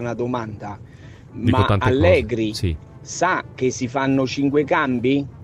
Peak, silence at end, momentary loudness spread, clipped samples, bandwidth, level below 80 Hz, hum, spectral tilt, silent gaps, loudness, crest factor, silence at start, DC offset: -2 dBFS; 0 s; 16 LU; under 0.1%; 12.5 kHz; -40 dBFS; none; -6 dB/octave; none; -20 LUFS; 18 dB; 0 s; under 0.1%